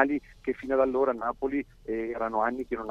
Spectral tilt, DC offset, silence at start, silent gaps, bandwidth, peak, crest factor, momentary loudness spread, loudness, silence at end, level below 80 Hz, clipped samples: -7.5 dB/octave; under 0.1%; 0 s; none; 7.2 kHz; -6 dBFS; 22 dB; 8 LU; -29 LUFS; 0 s; -54 dBFS; under 0.1%